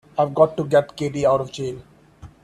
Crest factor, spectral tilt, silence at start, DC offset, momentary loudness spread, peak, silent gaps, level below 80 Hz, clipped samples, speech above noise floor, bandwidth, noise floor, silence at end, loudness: 20 dB; -6.5 dB/octave; 0.15 s; under 0.1%; 13 LU; -2 dBFS; none; -54 dBFS; under 0.1%; 25 dB; 12 kHz; -45 dBFS; 0.15 s; -21 LUFS